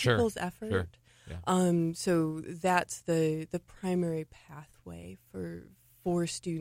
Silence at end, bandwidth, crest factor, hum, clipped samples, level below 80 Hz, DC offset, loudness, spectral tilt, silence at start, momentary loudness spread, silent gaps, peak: 0 s; 16 kHz; 20 dB; none; under 0.1%; -58 dBFS; under 0.1%; -32 LUFS; -5.5 dB/octave; 0 s; 19 LU; none; -10 dBFS